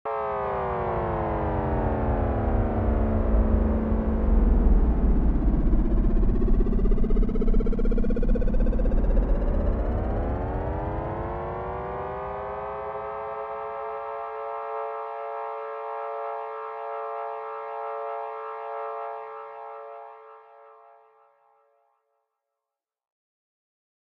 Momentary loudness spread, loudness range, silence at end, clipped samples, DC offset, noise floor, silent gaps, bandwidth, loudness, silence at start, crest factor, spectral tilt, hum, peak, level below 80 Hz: 9 LU; 11 LU; 3.6 s; under 0.1%; under 0.1%; -89 dBFS; none; 3.6 kHz; -28 LUFS; 0.05 s; 16 dB; -11 dB/octave; none; -10 dBFS; -26 dBFS